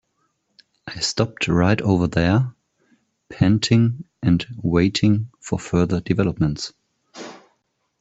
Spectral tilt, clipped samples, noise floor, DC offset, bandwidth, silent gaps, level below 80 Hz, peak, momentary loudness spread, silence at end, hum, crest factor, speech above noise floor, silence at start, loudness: -6 dB/octave; under 0.1%; -70 dBFS; under 0.1%; 8.2 kHz; none; -46 dBFS; -4 dBFS; 15 LU; 0.65 s; none; 18 dB; 51 dB; 0.85 s; -20 LUFS